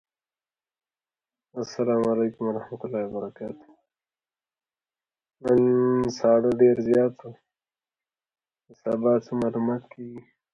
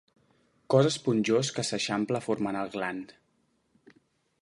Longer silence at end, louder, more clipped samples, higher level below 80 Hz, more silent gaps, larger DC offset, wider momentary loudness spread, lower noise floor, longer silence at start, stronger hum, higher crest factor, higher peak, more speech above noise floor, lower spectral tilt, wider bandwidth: second, 0.35 s vs 1.3 s; first, -24 LUFS vs -28 LUFS; neither; first, -64 dBFS vs -72 dBFS; neither; neither; first, 19 LU vs 10 LU; first, under -90 dBFS vs -72 dBFS; first, 1.55 s vs 0.7 s; neither; about the same, 20 dB vs 20 dB; about the same, -8 dBFS vs -10 dBFS; first, over 66 dB vs 44 dB; first, -7.5 dB/octave vs -5 dB/octave; second, 7.4 kHz vs 11.5 kHz